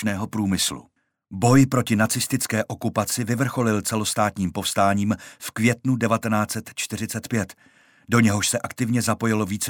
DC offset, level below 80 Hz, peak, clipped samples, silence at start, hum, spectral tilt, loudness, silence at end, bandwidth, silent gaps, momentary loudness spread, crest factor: under 0.1%; -56 dBFS; -6 dBFS; under 0.1%; 0 s; none; -4.5 dB/octave; -22 LUFS; 0 s; 18.5 kHz; none; 9 LU; 18 dB